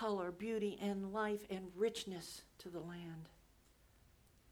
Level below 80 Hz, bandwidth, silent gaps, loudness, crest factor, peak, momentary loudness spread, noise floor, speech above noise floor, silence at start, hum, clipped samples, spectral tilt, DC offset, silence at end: -72 dBFS; over 20 kHz; none; -43 LUFS; 16 dB; -28 dBFS; 12 LU; -69 dBFS; 27 dB; 0 s; none; under 0.1%; -5 dB/octave; under 0.1%; 0 s